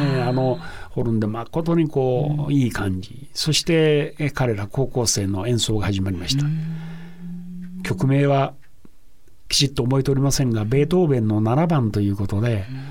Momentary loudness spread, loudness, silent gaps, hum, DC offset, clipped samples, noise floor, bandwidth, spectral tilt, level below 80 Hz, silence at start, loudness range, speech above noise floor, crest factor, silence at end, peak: 12 LU; -21 LUFS; none; none; 1%; under 0.1%; -52 dBFS; 16.5 kHz; -5.5 dB/octave; -40 dBFS; 0 s; 4 LU; 31 dB; 18 dB; 0 s; -4 dBFS